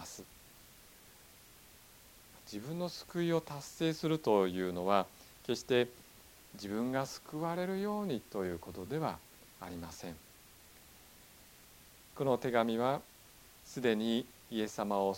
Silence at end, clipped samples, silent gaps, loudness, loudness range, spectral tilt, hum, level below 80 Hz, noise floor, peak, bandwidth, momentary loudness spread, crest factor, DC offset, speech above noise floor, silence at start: 0 s; under 0.1%; none; -36 LUFS; 9 LU; -5.5 dB/octave; none; -68 dBFS; -59 dBFS; -14 dBFS; 17 kHz; 25 LU; 24 dB; under 0.1%; 24 dB; 0 s